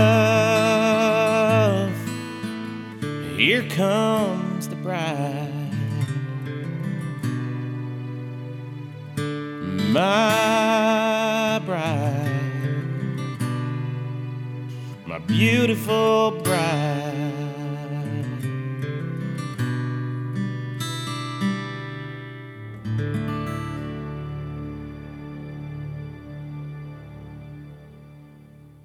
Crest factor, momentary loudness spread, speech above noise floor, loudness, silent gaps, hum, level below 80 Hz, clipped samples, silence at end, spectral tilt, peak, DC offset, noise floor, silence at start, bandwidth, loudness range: 20 dB; 17 LU; 26 dB; -24 LUFS; none; none; -54 dBFS; under 0.1%; 0.05 s; -6 dB/octave; -4 dBFS; under 0.1%; -47 dBFS; 0 s; 17 kHz; 11 LU